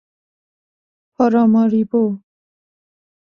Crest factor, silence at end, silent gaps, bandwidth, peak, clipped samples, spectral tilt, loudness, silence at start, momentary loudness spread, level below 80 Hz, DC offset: 18 dB; 1.15 s; none; 6.2 kHz; -2 dBFS; under 0.1%; -9.5 dB/octave; -16 LUFS; 1.2 s; 8 LU; -64 dBFS; under 0.1%